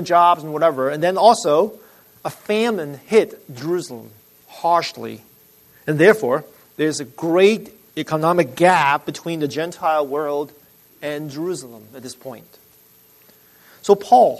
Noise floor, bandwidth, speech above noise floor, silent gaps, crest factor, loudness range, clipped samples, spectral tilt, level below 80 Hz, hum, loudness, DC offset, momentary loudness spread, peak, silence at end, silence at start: -52 dBFS; 13.5 kHz; 34 dB; none; 20 dB; 8 LU; under 0.1%; -5 dB/octave; -66 dBFS; none; -18 LUFS; under 0.1%; 19 LU; 0 dBFS; 0 s; 0 s